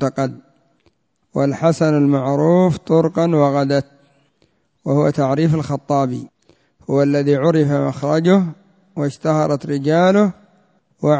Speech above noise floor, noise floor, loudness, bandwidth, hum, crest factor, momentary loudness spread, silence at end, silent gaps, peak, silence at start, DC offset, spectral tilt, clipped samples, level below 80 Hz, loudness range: 46 dB; -62 dBFS; -17 LUFS; 8 kHz; none; 16 dB; 10 LU; 0 s; none; -2 dBFS; 0 s; under 0.1%; -8 dB/octave; under 0.1%; -56 dBFS; 3 LU